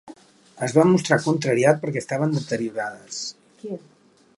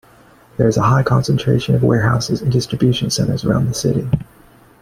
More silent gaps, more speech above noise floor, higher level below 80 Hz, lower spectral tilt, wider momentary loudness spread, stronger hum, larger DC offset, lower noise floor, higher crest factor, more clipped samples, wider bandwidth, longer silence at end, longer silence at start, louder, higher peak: neither; second, 26 dB vs 32 dB; second, -68 dBFS vs -40 dBFS; about the same, -5.5 dB/octave vs -6 dB/octave; first, 18 LU vs 5 LU; neither; neither; about the same, -48 dBFS vs -47 dBFS; first, 22 dB vs 16 dB; neither; second, 11.5 kHz vs 15 kHz; about the same, 0.6 s vs 0.6 s; second, 0.05 s vs 0.6 s; second, -22 LUFS vs -16 LUFS; about the same, -2 dBFS vs 0 dBFS